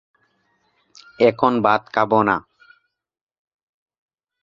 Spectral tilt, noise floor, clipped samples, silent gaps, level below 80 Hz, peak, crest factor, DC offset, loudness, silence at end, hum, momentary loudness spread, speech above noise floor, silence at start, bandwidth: -7 dB/octave; -66 dBFS; under 0.1%; none; -60 dBFS; 0 dBFS; 22 dB; under 0.1%; -18 LUFS; 2 s; none; 4 LU; 48 dB; 1.2 s; 7.4 kHz